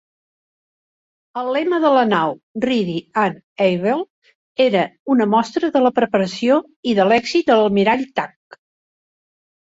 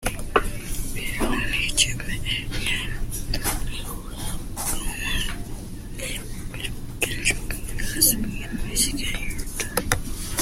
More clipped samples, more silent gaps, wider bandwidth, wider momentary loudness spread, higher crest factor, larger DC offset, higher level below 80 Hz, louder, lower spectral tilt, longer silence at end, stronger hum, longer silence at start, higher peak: neither; first, 2.43-2.55 s, 3.43-3.56 s, 4.10-4.22 s, 4.35-4.55 s, 5.00-5.06 s, 6.76-6.83 s vs none; second, 8 kHz vs 16.5 kHz; second, 9 LU vs 12 LU; second, 16 dB vs 24 dB; neither; second, -60 dBFS vs -32 dBFS; first, -18 LUFS vs -26 LUFS; first, -6 dB/octave vs -2.5 dB/octave; first, 1.45 s vs 0 s; neither; first, 1.35 s vs 0 s; about the same, -2 dBFS vs 0 dBFS